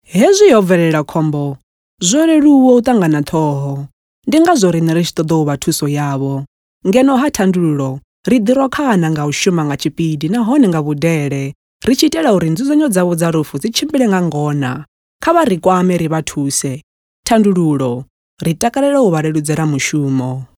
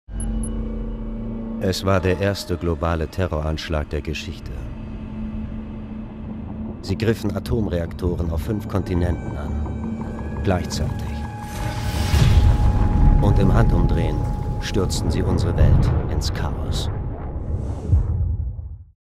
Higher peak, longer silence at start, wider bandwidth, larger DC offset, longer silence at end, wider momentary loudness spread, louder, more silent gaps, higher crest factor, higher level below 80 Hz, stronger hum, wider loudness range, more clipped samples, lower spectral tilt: first, 0 dBFS vs -4 dBFS; about the same, 0.1 s vs 0.1 s; first, 17.5 kHz vs 15 kHz; neither; about the same, 0.15 s vs 0.25 s; second, 11 LU vs 14 LU; first, -14 LUFS vs -23 LUFS; first, 1.63-1.98 s, 3.93-4.22 s, 6.47-6.81 s, 8.04-8.23 s, 11.55-11.80 s, 14.88-15.19 s, 16.83-17.23 s, 18.10-18.37 s vs none; about the same, 14 dB vs 18 dB; second, -48 dBFS vs -24 dBFS; neither; second, 3 LU vs 8 LU; neither; about the same, -5.5 dB/octave vs -6.5 dB/octave